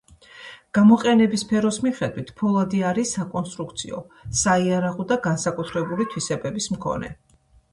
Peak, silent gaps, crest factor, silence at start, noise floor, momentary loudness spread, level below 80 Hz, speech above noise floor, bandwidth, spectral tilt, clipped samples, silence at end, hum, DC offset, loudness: -4 dBFS; none; 18 dB; 0.35 s; -44 dBFS; 14 LU; -52 dBFS; 23 dB; 11.5 kHz; -5 dB/octave; under 0.1%; 0.6 s; none; under 0.1%; -22 LUFS